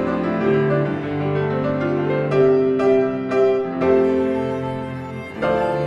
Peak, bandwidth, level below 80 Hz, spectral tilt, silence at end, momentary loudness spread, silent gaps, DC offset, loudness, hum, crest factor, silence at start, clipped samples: -4 dBFS; 7.2 kHz; -50 dBFS; -8.5 dB/octave; 0 s; 8 LU; none; under 0.1%; -19 LUFS; none; 14 dB; 0 s; under 0.1%